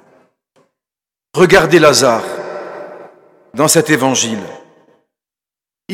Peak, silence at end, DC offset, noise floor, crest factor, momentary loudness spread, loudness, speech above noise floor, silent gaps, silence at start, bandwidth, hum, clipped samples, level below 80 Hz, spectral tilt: 0 dBFS; 0 s; under 0.1%; -89 dBFS; 16 dB; 21 LU; -11 LUFS; 78 dB; none; 1.35 s; 17 kHz; none; 0.2%; -48 dBFS; -3.5 dB/octave